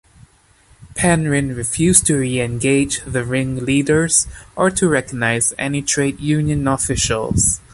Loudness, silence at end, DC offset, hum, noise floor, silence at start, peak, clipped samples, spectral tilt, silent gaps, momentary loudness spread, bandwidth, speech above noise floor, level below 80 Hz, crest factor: -17 LUFS; 0.15 s; under 0.1%; none; -52 dBFS; 0.8 s; 0 dBFS; under 0.1%; -4 dB/octave; none; 7 LU; 13 kHz; 35 dB; -38 dBFS; 18 dB